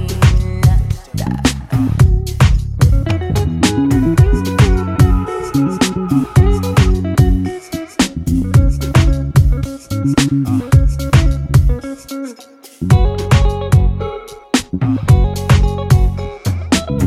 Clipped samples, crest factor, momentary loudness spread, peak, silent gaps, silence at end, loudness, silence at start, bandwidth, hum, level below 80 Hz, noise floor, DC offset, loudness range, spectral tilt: under 0.1%; 12 dB; 8 LU; 0 dBFS; none; 0 s; -14 LUFS; 0 s; 15.5 kHz; none; -18 dBFS; -39 dBFS; under 0.1%; 2 LU; -6.5 dB/octave